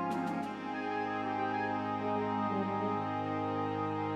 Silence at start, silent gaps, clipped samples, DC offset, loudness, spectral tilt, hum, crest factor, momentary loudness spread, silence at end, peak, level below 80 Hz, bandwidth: 0 s; none; under 0.1%; under 0.1%; -35 LUFS; -7.5 dB/octave; none; 14 dB; 3 LU; 0 s; -20 dBFS; -72 dBFS; 11.5 kHz